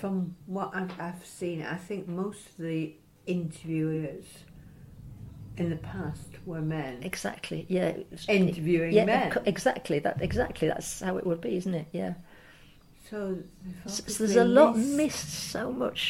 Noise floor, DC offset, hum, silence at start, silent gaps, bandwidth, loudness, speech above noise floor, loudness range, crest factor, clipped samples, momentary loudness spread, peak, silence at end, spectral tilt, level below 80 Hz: -55 dBFS; under 0.1%; none; 0 s; none; 16.5 kHz; -29 LUFS; 26 dB; 9 LU; 24 dB; under 0.1%; 16 LU; -6 dBFS; 0 s; -5.5 dB/octave; -54 dBFS